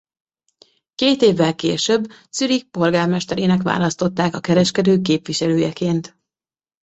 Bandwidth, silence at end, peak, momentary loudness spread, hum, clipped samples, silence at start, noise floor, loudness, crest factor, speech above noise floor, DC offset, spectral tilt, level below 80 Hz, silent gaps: 8.2 kHz; 0.75 s; -2 dBFS; 6 LU; none; under 0.1%; 1 s; under -90 dBFS; -18 LUFS; 16 dB; over 72 dB; under 0.1%; -5 dB/octave; -56 dBFS; none